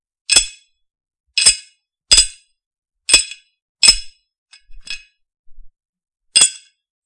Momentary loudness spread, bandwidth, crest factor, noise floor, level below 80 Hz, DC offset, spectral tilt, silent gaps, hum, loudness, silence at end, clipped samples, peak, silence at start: 19 LU; 12 kHz; 20 dB; -52 dBFS; -40 dBFS; under 0.1%; 2.5 dB/octave; 1.20-1.24 s, 2.66-2.71 s, 2.78-2.82 s, 3.62-3.75 s, 4.38-4.46 s, 5.39-5.44 s, 5.89-5.93 s; none; -12 LUFS; 0.5 s; 0.1%; 0 dBFS; 0.3 s